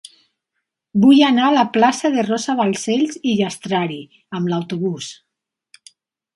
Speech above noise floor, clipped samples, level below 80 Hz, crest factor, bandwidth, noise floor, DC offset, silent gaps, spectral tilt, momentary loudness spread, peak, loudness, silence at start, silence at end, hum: 61 dB; under 0.1%; -64 dBFS; 18 dB; 11.5 kHz; -77 dBFS; under 0.1%; none; -5 dB/octave; 13 LU; -2 dBFS; -17 LUFS; 0.95 s; 1.25 s; none